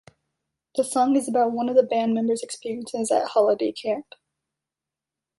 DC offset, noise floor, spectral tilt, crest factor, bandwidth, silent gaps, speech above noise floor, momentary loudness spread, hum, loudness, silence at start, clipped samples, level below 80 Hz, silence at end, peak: under 0.1%; -88 dBFS; -4.5 dB/octave; 18 dB; 11.5 kHz; none; 66 dB; 10 LU; none; -23 LUFS; 0.75 s; under 0.1%; -70 dBFS; 1.35 s; -6 dBFS